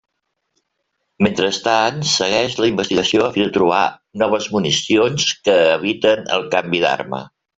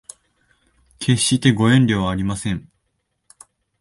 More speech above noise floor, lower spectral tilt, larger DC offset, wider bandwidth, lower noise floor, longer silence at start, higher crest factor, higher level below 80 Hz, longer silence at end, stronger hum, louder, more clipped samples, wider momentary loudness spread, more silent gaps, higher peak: about the same, 56 dB vs 55 dB; second, -3.5 dB/octave vs -5 dB/octave; neither; second, 8.2 kHz vs 11.5 kHz; about the same, -72 dBFS vs -72 dBFS; first, 1.2 s vs 1 s; about the same, 16 dB vs 20 dB; second, -56 dBFS vs -44 dBFS; second, 0.3 s vs 1.2 s; neither; about the same, -17 LUFS vs -18 LUFS; neither; second, 4 LU vs 11 LU; neither; about the same, -2 dBFS vs -2 dBFS